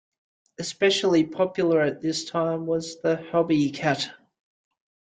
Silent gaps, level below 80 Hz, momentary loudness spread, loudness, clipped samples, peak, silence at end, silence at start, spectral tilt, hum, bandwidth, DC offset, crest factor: none; -66 dBFS; 7 LU; -24 LUFS; under 0.1%; -8 dBFS; 0.9 s; 0.6 s; -5 dB/octave; none; 9.4 kHz; under 0.1%; 16 dB